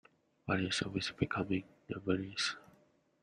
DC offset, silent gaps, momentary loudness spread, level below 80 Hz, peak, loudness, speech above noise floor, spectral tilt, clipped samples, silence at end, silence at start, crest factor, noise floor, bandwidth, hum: under 0.1%; none; 11 LU; -66 dBFS; -18 dBFS; -37 LUFS; 33 dB; -4.5 dB/octave; under 0.1%; 0.65 s; 0.45 s; 20 dB; -69 dBFS; 10.5 kHz; none